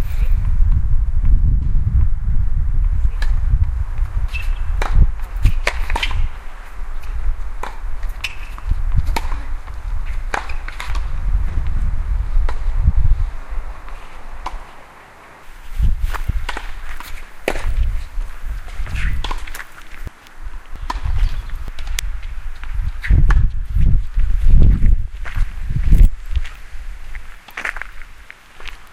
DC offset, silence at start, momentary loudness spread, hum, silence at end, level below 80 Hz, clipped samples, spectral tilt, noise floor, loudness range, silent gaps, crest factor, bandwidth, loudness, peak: under 0.1%; 0 s; 18 LU; none; 0.05 s; -18 dBFS; under 0.1%; -5.5 dB/octave; -41 dBFS; 9 LU; none; 16 dB; 10 kHz; -23 LUFS; 0 dBFS